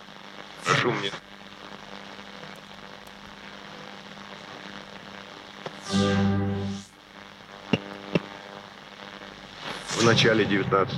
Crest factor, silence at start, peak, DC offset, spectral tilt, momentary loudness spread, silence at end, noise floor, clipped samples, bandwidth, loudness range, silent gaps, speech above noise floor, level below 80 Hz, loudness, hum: 24 dB; 0 s; -6 dBFS; under 0.1%; -4.5 dB/octave; 20 LU; 0 s; -47 dBFS; under 0.1%; 12.5 kHz; 15 LU; none; 24 dB; -60 dBFS; -25 LUFS; none